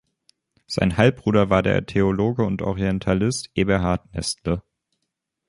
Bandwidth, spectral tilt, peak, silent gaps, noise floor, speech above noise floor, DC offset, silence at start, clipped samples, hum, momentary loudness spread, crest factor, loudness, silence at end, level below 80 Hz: 11.5 kHz; -6 dB/octave; -2 dBFS; none; -79 dBFS; 58 dB; under 0.1%; 0.7 s; under 0.1%; none; 8 LU; 20 dB; -22 LUFS; 0.9 s; -40 dBFS